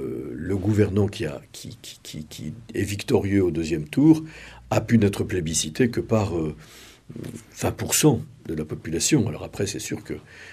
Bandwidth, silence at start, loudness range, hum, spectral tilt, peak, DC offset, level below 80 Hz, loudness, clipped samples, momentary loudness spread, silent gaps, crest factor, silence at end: 15 kHz; 0 s; 3 LU; none; -5 dB/octave; -4 dBFS; under 0.1%; -48 dBFS; -24 LUFS; under 0.1%; 18 LU; none; 20 dB; 0 s